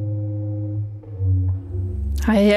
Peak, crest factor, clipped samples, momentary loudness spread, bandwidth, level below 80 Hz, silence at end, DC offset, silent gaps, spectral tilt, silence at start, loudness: -6 dBFS; 14 dB; under 0.1%; 8 LU; 14 kHz; -32 dBFS; 0 s; under 0.1%; none; -7.5 dB/octave; 0 s; -24 LUFS